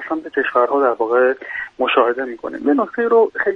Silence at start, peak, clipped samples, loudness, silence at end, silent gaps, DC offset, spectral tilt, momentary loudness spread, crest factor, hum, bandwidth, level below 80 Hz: 0 s; 0 dBFS; under 0.1%; -17 LUFS; 0 s; none; under 0.1%; -6 dB/octave; 9 LU; 16 dB; none; 4.9 kHz; -60 dBFS